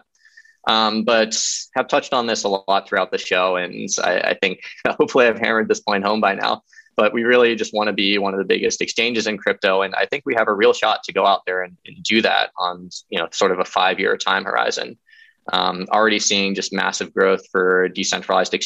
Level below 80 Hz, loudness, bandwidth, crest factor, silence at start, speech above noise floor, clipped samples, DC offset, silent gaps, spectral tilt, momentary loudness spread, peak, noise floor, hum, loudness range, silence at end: -66 dBFS; -19 LUFS; 8.6 kHz; 16 dB; 0.65 s; 32 dB; under 0.1%; under 0.1%; none; -2.5 dB/octave; 8 LU; -2 dBFS; -51 dBFS; none; 2 LU; 0 s